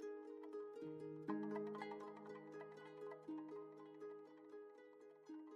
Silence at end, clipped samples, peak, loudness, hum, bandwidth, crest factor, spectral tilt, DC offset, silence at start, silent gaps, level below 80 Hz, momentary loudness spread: 0 s; under 0.1%; -32 dBFS; -53 LUFS; none; 9.8 kHz; 20 dB; -7.5 dB/octave; under 0.1%; 0 s; none; under -90 dBFS; 12 LU